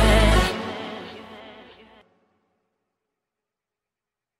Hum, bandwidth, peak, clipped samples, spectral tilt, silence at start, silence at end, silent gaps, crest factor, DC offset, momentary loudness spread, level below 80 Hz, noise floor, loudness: none; 14 kHz; -6 dBFS; under 0.1%; -5 dB/octave; 0 s; 2.9 s; none; 20 dB; under 0.1%; 25 LU; -30 dBFS; -88 dBFS; -22 LUFS